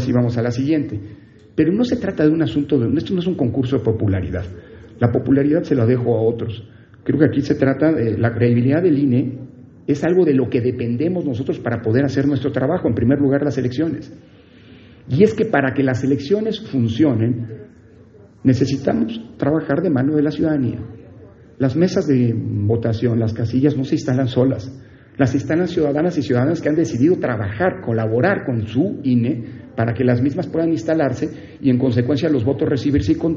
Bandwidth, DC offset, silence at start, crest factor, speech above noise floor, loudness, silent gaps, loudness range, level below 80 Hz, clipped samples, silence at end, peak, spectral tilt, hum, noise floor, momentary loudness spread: 7.4 kHz; under 0.1%; 0 s; 18 dB; 28 dB; -18 LUFS; none; 2 LU; -46 dBFS; under 0.1%; 0 s; 0 dBFS; -7.5 dB/octave; none; -45 dBFS; 8 LU